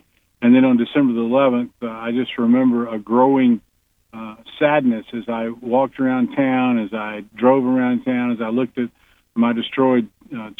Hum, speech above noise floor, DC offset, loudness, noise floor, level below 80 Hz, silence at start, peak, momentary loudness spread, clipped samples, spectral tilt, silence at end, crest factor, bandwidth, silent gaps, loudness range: none; 33 dB; under 0.1%; -18 LUFS; -51 dBFS; -62 dBFS; 0.4 s; -2 dBFS; 12 LU; under 0.1%; -8.5 dB/octave; 0.05 s; 16 dB; 3.9 kHz; none; 3 LU